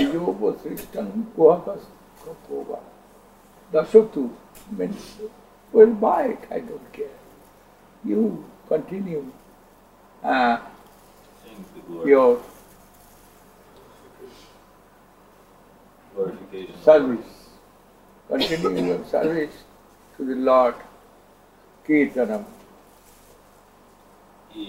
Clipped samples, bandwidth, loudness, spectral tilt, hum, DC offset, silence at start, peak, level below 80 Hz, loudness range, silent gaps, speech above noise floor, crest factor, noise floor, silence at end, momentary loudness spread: under 0.1%; 16 kHz; -22 LUFS; -6 dB/octave; 50 Hz at -55 dBFS; under 0.1%; 0 s; -2 dBFS; -58 dBFS; 7 LU; none; 32 dB; 24 dB; -53 dBFS; 0 s; 23 LU